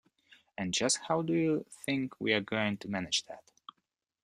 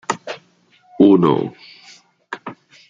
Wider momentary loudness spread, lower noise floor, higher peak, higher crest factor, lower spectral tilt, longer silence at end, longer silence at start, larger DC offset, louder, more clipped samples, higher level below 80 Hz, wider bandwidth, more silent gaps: second, 10 LU vs 22 LU; first, -83 dBFS vs -55 dBFS; second, -12 dBFS vs -2 dBFS; about the same, 22 dB vs 18 dB; second, -3.5 dB/octave vs -6.5 dB/octave; first, 0.85 s vs 0.35 s; first, 0.6 s vs 0.1 s; neither; second, -32 LUFS vs -16 LUFS; neither; second, -70 dBFS vs -60 dBFS; first, 13.5 kHz vs 7.8 kHz; neither